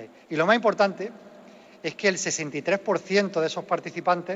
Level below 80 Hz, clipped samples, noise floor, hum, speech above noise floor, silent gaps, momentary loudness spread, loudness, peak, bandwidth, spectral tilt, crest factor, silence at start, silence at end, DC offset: -76 dBFS; under 0.1%; -49 dBFS; none; 24 dB; none; 13 LU; -25 LUFS; -6 dBFS; 8 kHz; -3.5 dB/octave; 20 dB; 0 s; 0 s; under 0.1%